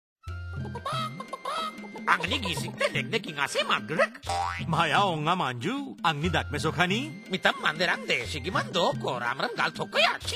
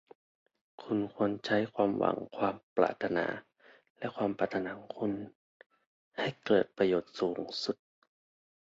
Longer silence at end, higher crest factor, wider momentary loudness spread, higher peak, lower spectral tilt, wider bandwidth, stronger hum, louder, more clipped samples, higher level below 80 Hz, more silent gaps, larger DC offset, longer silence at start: second, 0 s vs 0.9 s; about the same, 22 dB vs 22 dB; second, 9 LU vs 12 LU; first, -6 dBFS vs -12 dBFS; second, -4 dB/octave vs -6.5 dB/octave; first, 16 kHz vs 7.8 kHz; neither; first, -28 LUFS vs -33 LUFS; neither; first, -48 dBFS vs -70 dBFS; second, none vs 2.63-2.76 s, 3.90-3.95 s, 5.35-5.60 s, 5.66-5.70 s, 5.86-6.11 s; neither; second, 0.25 s vs 0.8 s